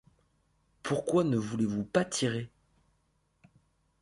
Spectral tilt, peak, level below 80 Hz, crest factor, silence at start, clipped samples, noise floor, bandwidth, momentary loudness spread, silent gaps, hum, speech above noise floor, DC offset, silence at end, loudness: -5.5 dB/octave; -14 dBFS; -66 dBFS; 20 dB; 0.85 s; under 0.1%; -73 dBFS; 11.5 kHz; 11 LU; none; none; 44 dB; under 0.1%; 1.55 s; -31 LUFS